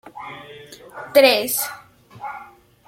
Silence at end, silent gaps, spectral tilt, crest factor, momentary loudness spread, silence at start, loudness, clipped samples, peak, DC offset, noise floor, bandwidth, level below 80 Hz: 0.45 s; none; -1.5 dB/octave; 22 dB; 26 LU; 0.05 s; -17 LUFS; under 0.1%; -2 dBFS; under 0.1%; -44 dBFS; 16.5 kHz; -64 dBFS